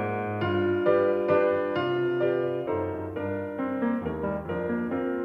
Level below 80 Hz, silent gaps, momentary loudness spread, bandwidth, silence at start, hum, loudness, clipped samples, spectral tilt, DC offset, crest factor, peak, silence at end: -58 dBFS; none; 8 LU; 5.4 kHz; 0 s; none; -27 LUFS; under 0.1%; -9 dB/octave; under 0.1%; 16 dB; -10 dBFS; 0 s